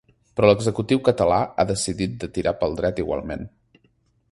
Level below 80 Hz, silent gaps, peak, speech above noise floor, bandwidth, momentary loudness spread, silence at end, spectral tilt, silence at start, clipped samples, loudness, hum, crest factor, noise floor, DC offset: -44 dBFS; none; 0 dBFS; 43 dB; 11.5 kHz; 13 LU; 0.85 s; -5.5 dB/octave; 0.35 s; under 0.1%; -22 LUFS; none; 22 dB; -64 dBFS; under 0.1%